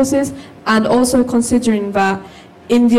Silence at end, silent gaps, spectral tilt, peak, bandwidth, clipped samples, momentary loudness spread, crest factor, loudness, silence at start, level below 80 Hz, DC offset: 0 s; none; -4.5 dB/octave; -4 dBFS; 14.5 kHz; under 0.1%; 9 LU; 10 dB; -15 LUFS; 0 s; -44 dBFS; under 0.1%